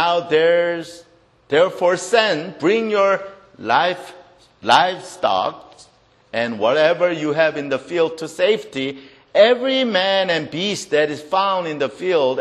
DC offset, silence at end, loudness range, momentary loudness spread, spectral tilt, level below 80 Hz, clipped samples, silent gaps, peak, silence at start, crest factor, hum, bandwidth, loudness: under 0.1%; 0 s; 2 LU; 11 LU; -4 dB/octave; -64 dBFS; under 0.1%; none; 0 dBFS; 0 s; 18 dB; none; 12.5 kHz; -18 LUFS